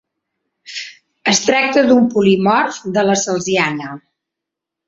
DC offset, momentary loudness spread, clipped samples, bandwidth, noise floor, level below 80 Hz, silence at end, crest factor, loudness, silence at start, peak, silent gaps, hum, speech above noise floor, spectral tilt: under 0.1%; 17 LU; under 0.1%; 8 kHz; -82 dBFS; -58 dBFS; 0.9 s; 16 dB; -14 LUFS; 0.7 s; 0 dBFS; none; none; 68 dB; -4 dB/octave